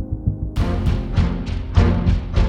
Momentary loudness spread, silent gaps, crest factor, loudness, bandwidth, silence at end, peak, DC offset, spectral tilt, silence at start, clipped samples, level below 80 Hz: 7 LU; none; 18 dB; -21 LUFS; 7.6 kHz; 0 s; -2 dBFS; under 0.1%; -8 dB/octave; 0 s; under 0.1%; -22 dBFS